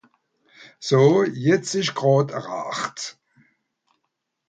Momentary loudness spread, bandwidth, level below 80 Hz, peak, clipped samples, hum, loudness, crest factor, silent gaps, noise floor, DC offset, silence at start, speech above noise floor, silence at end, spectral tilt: 15 LU; 9.2 kHz; -66 dBFS; -4 dBFS; under 0.1%; none; -21 LUFS; 18 dB; none; -78 dBFS; under 0.1%; 0.6 s; 57 dB; 1.35 s; -5.5 dB/octave